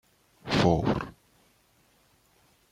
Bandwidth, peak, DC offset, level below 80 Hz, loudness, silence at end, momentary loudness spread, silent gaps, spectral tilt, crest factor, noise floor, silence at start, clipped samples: 14 kHz; -8 dBFS; under 0.1%; -50 dBFS; -26 LUFS; 1.6 s; 19 LU; none; -6.5 dB/octave; 22 dB; -65 dBFS; 0.45 s; under 0.1%